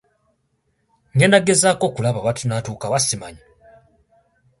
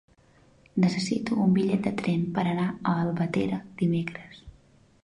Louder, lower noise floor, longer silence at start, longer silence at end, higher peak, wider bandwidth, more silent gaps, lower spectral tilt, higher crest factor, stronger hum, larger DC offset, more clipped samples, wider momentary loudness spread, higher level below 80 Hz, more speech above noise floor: first, -18 LUFS vs -27 LUFS; first, -68 dBFS vs -59 dBFS; first, 1.15 s vs 0.75 s; first, 1.25 s vs 0.55 s; first, 0 dBFS vs -12 dBFS; about the same, 11.5 kHz vs 10.5 kHz; neither; second, -4 dB/octave vs -7 dB/octave; first, 22 dB vs 16 dB; neither; neither; neither; first, 12 LU vs 8 LU; about the same, -54 dBFS vs -58 dBFS; first, 50 dB vs 33 dB